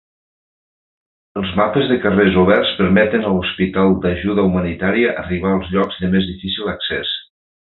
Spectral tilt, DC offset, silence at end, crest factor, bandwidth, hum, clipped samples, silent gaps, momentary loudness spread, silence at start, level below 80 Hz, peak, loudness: -9.5 dB/octave; under 0.1%; 0.5 s; 16 dB; 4.2 kHz; none; under 0.1%; none; 8 LU; 1.35 s; -38 dBFS; -2 dBFS; -17 LUFS